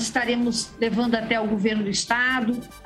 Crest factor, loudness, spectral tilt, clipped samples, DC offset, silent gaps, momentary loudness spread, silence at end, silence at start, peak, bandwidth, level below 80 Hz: 16 dB; -23 LUFS; -3.5 dB/octave; under 0.1%; under 0.1%; none; 4 LU; 0 s; 0 s; -6 dBFS; 13.5 kHz; -52 dBFS